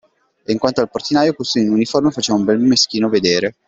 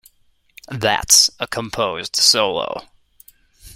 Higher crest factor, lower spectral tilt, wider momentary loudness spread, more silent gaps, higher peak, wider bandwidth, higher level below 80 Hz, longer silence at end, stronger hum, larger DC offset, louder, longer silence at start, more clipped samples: about the same, 16 dB vs 20 dB; first, -4 dB/octave vs -0.5 dB/octave; second, 5 LU vs 16 LU; neither; about the same, 0 dBFS vs 0 dBFS; second, 8 kHz vs 16.5 kHz; second, -54 dBFS vs -48 dBFS; about the same, 0.15 s vs 0.05 s; neither; neither; about the same, -16 LUFS vs -15 LUFS; second, 0.5 s vs 0.7 s; neither